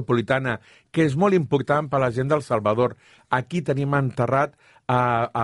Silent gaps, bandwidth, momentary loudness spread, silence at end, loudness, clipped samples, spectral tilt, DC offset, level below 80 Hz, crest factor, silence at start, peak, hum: none; 11.5 kHz; 6 LU; 0 s; -23 LUFS; under 0.1%; -7.5 dB/octave; under 0.1%; -56 dBFS; 18 dB; 0 s; -6 dBFS; none